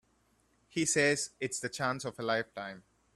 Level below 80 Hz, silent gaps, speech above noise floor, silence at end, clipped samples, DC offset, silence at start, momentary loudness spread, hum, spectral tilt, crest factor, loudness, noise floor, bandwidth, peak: -72 dBFS; none; 38 dB; 0.35 s; under 0.1%; under 0.1%; 0.75 s; 15 LU; none; -3 dB/octave; 20 dB; -32 LUFS; -71 dBFS; 13.5 kHz; -14 dBFS